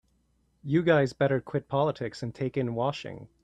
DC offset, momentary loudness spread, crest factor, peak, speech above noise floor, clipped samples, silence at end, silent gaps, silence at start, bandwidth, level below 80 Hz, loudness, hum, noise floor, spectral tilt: under 0.1%; 13 LU; 18 dB; -10 dBFS; 42 dB; under 0.1%; 0.15 s; none; 0.65 s; 9.2 kHz; -62 dBFS; -28 LUFS; none; -70 dBFS; -7.5 dB/octave